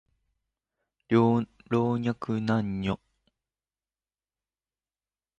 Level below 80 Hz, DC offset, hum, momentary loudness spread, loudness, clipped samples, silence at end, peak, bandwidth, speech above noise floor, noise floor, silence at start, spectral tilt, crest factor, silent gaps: -58 dBFS; under 0.1%; none; 9 LU; -28 LUFS; under 0.1%; 2.45 s; -10 dBFS; 7.4 kHz; over 64 dB; under -90 dBFS; 1.1 s; -8.5 dB/octave; 22 dB; none